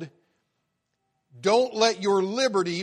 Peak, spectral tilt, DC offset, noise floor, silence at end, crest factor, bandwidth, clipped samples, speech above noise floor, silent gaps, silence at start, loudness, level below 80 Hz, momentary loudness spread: -6 dBFS; -3.5 dB/octave; under 0.1%; -77 dBFS; 0 s; 20 dB; 11 kHz; under 0.1%; 55 dB; none; 0 s; -23 LUFS; -74 dBFS; 6 LU